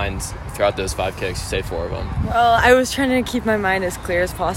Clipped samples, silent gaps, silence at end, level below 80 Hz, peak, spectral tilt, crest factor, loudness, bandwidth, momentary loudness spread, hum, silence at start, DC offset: under 0.1%; none; 0 s; -32 dBFS; -2 dBFS; -4.5 dB/octave; 16 dB; -19 LUFS; 16.5 kHz; 11 LU; none; 0 s; under 0.1%